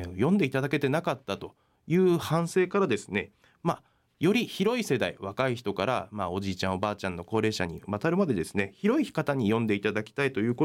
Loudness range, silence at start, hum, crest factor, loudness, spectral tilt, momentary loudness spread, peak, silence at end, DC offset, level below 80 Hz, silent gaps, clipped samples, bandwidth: 2 LU; 0 s; none; 14 dB; -28 LUFS; -6 dB/octave; 8 LU; -14 dBFS; 0 s; under 0.1%; -62 dBFS; none; under 0.1%; 16.5 kHz